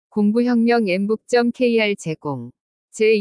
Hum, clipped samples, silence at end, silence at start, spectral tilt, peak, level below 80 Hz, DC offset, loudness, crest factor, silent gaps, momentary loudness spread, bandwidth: none; under 0.1%; 0 s; 0.15 s; -6 dB/octave; -6 dBFS; -68 dBFS; under 0.1%; -19 LUFS; 12 dB; 2.61-2.88 s; 13 LU; 10.5 kHz